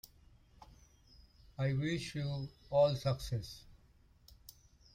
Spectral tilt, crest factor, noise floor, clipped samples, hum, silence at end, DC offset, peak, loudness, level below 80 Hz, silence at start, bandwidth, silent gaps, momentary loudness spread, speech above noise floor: -6.5 dB/octave; 20 dB; -66 dBFS; under 0.1%; none; 1.2 s; under 0.1%; -18 dBFS; -36 LUFS; -58 dBFS; 1.6 s; 16 kHz; none; 26 LU; 31 dB